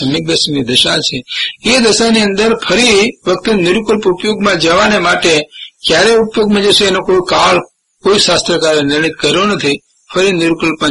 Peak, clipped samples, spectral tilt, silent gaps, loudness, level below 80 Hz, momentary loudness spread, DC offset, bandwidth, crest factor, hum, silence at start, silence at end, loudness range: 0 dBFS; under 0.1%; -3.5 dB/octave; none; -10 LUFS; -40 dBFS; 6 LU; under 0.1%; 11.5 kHz; 12 dB; none; 0 s; 0 s; 1 LU